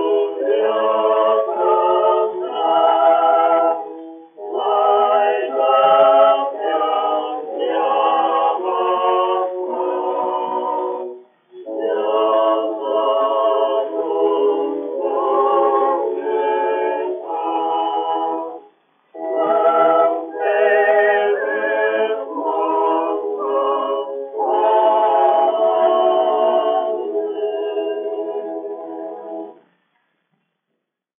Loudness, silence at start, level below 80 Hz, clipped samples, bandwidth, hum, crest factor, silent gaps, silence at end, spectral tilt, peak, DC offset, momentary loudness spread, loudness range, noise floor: -17 LUFS; 0 s; under -90 dBFS; under 0.1%; 3.7 kHz; none; 16 dB; none; 1.65 s; -0.5 dB/octave; -2 dBFS; under 0.1%; 11 LU; 6 LU; -76 dBFS